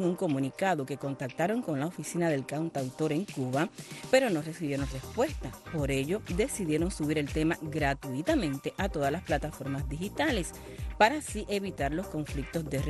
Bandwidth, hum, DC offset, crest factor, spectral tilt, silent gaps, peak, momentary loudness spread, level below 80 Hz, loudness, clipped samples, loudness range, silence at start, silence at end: 12.5 kHz; none; under 0.1%; 20 dB; -5.5 dB/octave; none; -10 dBFS; 9 LU; -44 dBFS; -31 LUFS; under 0.1%; 1 LU; 0 s; 0 s